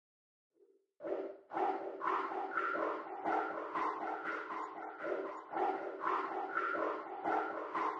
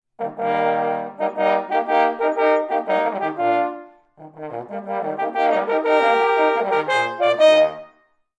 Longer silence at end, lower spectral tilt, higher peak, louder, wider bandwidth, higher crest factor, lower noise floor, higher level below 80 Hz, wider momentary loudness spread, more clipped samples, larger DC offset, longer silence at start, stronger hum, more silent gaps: second, 0 s vs 0.5 s; about the same, -5 dB/octave vs -4.5 dB/octave; second, -22 dBFS vs -4 dBFS; second, -39 LUFS vs -19 LUFS; second, 8.2 kHz vs 9.4 kHz; about the same, 16 dB vs 16 dB; first, -69 dBFS vs -58 dBFS; second, -84 dBFS vs -76 dBFS; second, 6 LU vs 13 LU; neither; neither; first, 1 s vs 0.2 s; neither; neither